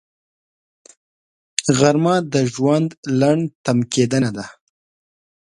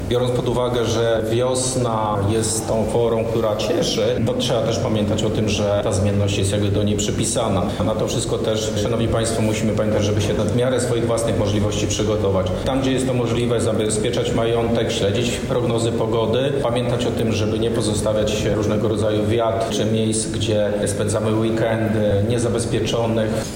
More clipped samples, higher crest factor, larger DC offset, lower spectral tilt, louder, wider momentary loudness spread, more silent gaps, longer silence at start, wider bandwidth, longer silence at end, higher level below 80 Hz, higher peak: neither; first, 20 dB vs 10 dB; neither; about the same, -5.5 dB/octave vs -5.5 dB/octave; about the same, -18 LUFS vs -20 LUFS; first, 8 LU vs 2 LU; first, 2.97-3.03 s, 3.55-3.64 s vs none; first, 1.6 s vs 0 s; second, 11.5 kHz vs 16.5 kHz; first, 1 s vs 0 s; second, -58 dBFS vs -38 dBFS; first, 0 dBFS vs -10 dBFS